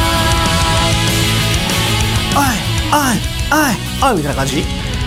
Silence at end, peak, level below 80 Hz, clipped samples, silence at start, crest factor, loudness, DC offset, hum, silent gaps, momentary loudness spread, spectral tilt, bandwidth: 0 s; -2 dBFS; -24 dBFS; under 0.1%; 0 s; 12 dB; -14 LUFS; under 0.1%; none; none; 4 LU; -4 dB/octave; 16.5 kHz